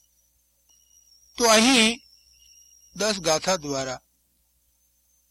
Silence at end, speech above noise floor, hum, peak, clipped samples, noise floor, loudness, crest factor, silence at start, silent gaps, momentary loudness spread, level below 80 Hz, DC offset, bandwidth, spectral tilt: 1.35 s; 46 dB; 60 Hz at -55 dBFS; -2 dBFS; under 0.1%; -68 dBFS; -21 LUFS; 24 dB; 1.4 s; none; 19 LU; -58 dBFS; under 0.1%; 16.5 kHz; -2 dB/octave